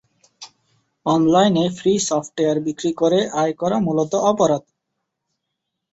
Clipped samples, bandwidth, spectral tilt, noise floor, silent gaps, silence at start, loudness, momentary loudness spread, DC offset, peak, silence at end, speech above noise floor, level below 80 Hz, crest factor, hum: under 0.1%; 8.2 kHz; -5.5 dB/octave; -79 dBFS; none; 0.4 s; -19 LUFS; 6 LU; under 0.1%; -4 dBFS; 1.3 s; 61 dB; -58 dBFS; 18 dB; none